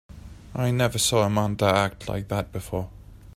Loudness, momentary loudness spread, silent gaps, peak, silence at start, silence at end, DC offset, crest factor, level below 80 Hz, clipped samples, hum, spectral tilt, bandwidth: -24 LUFS; 13 LU; none; -8 dBFS; 0.1 s; 0.05 s; under 0.1%; 18 dB; -46 dBFS; under 0.1%; none; -4.5 dB/octave; 16 kHz